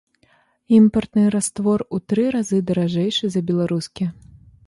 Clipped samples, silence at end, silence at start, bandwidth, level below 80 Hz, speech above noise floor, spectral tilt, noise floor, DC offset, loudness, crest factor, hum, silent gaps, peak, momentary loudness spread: under 0.1%; 0.55 s; 0.7 s; 11.5 kHz; -52 dBFS; 41 dB; -6 dB/octave; -60 dBFS; under 0.1%; -20 LUFS; 16 dB; none; none; -4 dBFS; 9 LU